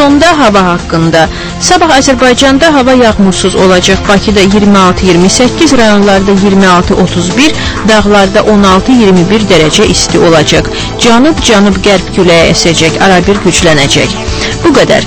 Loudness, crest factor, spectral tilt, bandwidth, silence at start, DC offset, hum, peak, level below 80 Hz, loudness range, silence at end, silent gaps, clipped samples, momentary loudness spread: -5 LUFS; 6 dB; -4.5 dB/octave; 11 kHz; 0 s; under 0.1%; none; 0 dBFS; -22 dBFS; 1 LU; 0 s; none; 6%; 4 LU